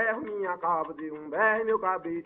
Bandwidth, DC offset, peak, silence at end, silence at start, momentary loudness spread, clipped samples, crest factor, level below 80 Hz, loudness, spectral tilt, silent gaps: 3.9 kHz; under 0.1%; -10 dBFS; 0.05 s; 0 s; 10 LU; under 0.1%; 18 dB; -70 dBFS; -28 LUFS; -4 dB/octave; none